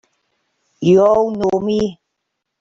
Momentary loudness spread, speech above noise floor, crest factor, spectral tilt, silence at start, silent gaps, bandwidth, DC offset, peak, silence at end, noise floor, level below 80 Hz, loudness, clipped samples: 9 LU; 62 dB; 14 dB; -7.5 dB/octave; 0.8 s; none; 7.6 kHz; under 0.1%; -2 dBFS; 0.65 s; -76 dBFS; -50 dBFS; -15 LUFS; under 0.1%